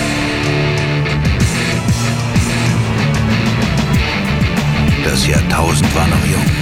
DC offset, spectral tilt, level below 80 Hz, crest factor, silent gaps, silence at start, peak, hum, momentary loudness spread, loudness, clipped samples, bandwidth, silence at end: under 0.1%; -5 dB/octave; -24 dBFS; 14 dB; none; 0 s; 0 dBFS; none; 3 LU; -14 LUFS; under 0.1%; 16.5 kHz; 0 s